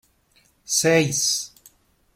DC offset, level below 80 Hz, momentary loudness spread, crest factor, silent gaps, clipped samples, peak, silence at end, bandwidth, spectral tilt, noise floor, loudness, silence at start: under 0.1%; -62 dBFS; 8 LU; 20 dB; none; under 0.1%; -4 dBFS; 0.7 s; 16.5 kHz; -2.5 dB/octave; -61 dBFS; -20 LUFS; 0.7 s